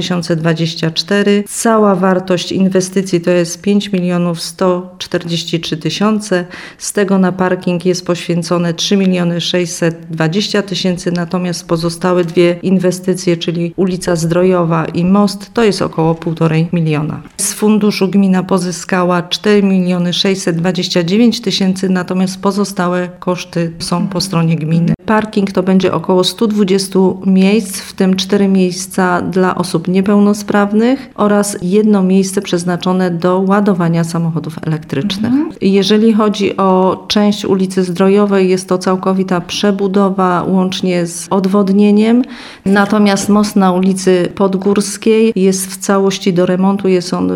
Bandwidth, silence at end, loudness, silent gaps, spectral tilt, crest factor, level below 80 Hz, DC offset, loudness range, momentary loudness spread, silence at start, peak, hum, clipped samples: 15.5 kHz; 0 s; -13 LUFS; none; -5.5 dB/octave; 12 dB; -48 dBFS; under 0.1%; 3 LU; 6 LU; 0 s; 0 dBFS; none; under 0.1%